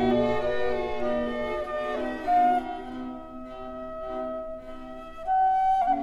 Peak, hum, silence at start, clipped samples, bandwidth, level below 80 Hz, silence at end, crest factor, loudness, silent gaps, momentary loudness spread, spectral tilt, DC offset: -12 dBFS; none; 0 s; under 0.1%; 10.5 kHz; -46 dBFS; 0 s; 14 dB; -27 LUFS; none; 17 LU; -6.5 dB/octave; under 0.1%